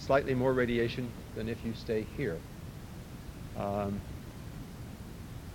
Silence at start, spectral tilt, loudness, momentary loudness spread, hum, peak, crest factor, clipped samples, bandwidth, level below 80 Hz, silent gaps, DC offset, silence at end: 0 s; -6.5 dB/octave; -34 LUFS; 17 LU; none; -12 dBFS; 22 dB; under 0.1%; 17 kHz; -50 dBFS; none; under 0.1%; 0 s